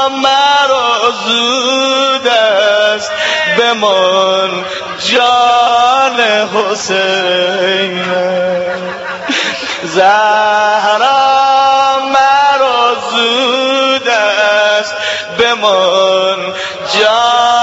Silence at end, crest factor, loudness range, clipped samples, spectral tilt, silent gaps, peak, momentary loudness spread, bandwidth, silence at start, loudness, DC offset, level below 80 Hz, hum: 0 s; 10 dB; 3 LU; under 0.1%; -2 dB/octave; none; 0 dBFS; 7 LU; 8.2 kHz; 0 s; -10 LUFS; under 0.1%; -56 dBFS; none